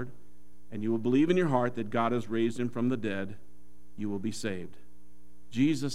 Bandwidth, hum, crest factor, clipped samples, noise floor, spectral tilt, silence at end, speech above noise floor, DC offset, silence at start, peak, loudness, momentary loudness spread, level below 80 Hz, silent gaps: 13.5 kHz; none; 20 dB; under 0.1%; -61 dBFS; -6.5 dB/octave; 0 s; 31 dB; 1%; 0 s; -12 dBFS; -30 LUFS; 15 LU; -64 dBFS; none